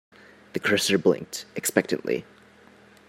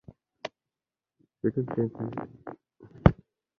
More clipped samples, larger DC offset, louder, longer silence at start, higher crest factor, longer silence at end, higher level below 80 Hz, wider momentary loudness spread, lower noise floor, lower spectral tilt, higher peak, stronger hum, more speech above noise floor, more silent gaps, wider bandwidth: neither; neither; first, -25 LUFS vs -29 LUFS; about the same, 0.55 s vs 0.45 s; about the same, 24 dB vs 28 dB; first, 0.85 s vs 0.45 s; second, -70 dBFS vs -42 dBFS; second, 10 LU vs 21 LU; second, -53 dBFS vs under -90 dBFS; second, -3.5 dB/octave vs -9.5 dB/octave; about the same, -4 dBFS vs -2 dBFS; neither; second, 28 dB vs over 58 dB; neither; first, 16 kHz vs 6.6 kHz